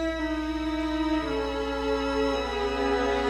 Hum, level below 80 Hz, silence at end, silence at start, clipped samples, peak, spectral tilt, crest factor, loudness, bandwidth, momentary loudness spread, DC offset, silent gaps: none; -40 dBFS; 0 s; 0 s; under 0.1%; -14 dBFS; -5.5 dB/octave; 12 dB; -28 LUFS; 12.5 kHz; 3 LU; under 0.1%; none